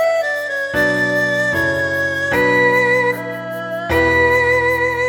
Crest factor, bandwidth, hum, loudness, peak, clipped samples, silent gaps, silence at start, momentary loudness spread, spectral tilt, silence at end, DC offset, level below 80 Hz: 14 dB; 18.5 kHz; none; -15 LUFS; -2 dBFS; under 0.1%; none; 0 s; 9 LU; -5 dB/octave; 0 s; under 0.1%; -40 dBFS